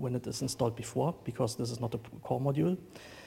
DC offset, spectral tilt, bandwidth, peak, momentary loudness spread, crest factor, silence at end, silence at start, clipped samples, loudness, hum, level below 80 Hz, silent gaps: under 0.1%; -6 dB/octave; 16.5 kHz; -16 dBFS; 7 LU; 18 dB; 0 s; 0 s; under 0.1%; -34 LUFS; none; -62 dBFS; none